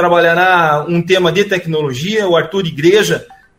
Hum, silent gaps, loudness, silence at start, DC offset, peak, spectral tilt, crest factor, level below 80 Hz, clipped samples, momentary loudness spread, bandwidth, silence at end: none; none; -13 LUFS; 0 s; under 0.1%; 0 dBFS; -5 dB/octave; 12 dB; -50 dBFS; under 0.1%; 7 LU; 16 kHz; 0.25 s